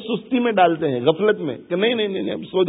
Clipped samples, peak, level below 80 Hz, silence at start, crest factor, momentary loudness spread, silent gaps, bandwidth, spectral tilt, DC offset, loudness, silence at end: under 0.1%; -2 dBFS; -64 dBFS; 0 s; 18 dB; 8 LU; none; 4 kHz; -11 dB/octave; under 0.1%; -20 LUFS; 0 s